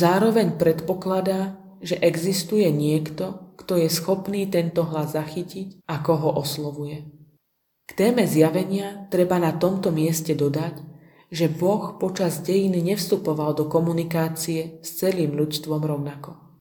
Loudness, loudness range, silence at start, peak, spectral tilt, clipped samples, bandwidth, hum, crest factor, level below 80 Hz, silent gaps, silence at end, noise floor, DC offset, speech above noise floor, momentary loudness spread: -23 LUFS; 3 LU; 0 s; -4 dBFS; -6 dB/octave; under 0.1%; 19 kHz; none; 18 dB; -62 dBFS; none; 0.25 s; -73 dBFS; under 0.1%; 51 dB; 12 LU